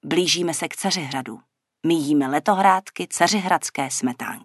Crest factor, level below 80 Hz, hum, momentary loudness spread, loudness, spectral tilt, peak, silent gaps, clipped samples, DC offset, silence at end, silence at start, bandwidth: 20 dB; -72 dBFS; none; 10 LU; -21 LUFS; -3.5 dB/octave; -2 dBFS; none; under 0.1%; under 0.1%; 0.05 s; 0.05 s; 12.5 kHz